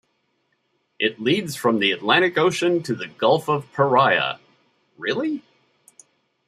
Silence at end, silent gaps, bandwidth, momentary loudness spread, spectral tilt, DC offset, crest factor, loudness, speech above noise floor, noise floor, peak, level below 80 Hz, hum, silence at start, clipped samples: 1.1 s; none; 14.5 kHz; 11 LU; -4.5 dB/octave; under 0.1%; 20 dB; -21 LUFS; 49 dB; -70 dBFS; -2 dBFS; -70 dBFS; none; 1 s; under 0.1%